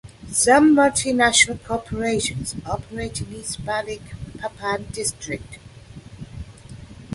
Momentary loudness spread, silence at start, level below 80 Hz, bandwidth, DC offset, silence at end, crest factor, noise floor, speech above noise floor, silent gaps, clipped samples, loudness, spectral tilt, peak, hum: 24 LU; 0.05 s; -44 dBFS; 11.5 kHz; under 0.1%; 0 s; 20 dB; -41 dBFS; 20 dB; none; under 0.1%; -20 LUFS; -3 dB/octave; -2 dBFS; none